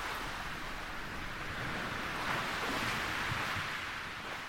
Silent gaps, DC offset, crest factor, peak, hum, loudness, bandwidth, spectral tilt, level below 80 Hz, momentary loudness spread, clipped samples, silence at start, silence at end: none; under 0.1%; 16 dB; -22 dBFS; none; -37 LUFS; over 20 kHz; -3.5 dB/octave; -52 dBFS; 7 LU; under 0.1%; 0 s; 0 s